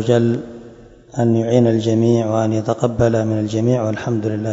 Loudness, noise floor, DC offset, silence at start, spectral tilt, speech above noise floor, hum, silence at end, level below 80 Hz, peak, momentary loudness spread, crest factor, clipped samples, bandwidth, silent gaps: -17 LUFS; -41 dBFS; under 0.1%; 0 s; -7.5 dB/octave; 25 dB; none; 0 s; -46 dBFS; 0 dBFS; 6 LU; 16 dB; under 0.1%; 7.8 kHz; none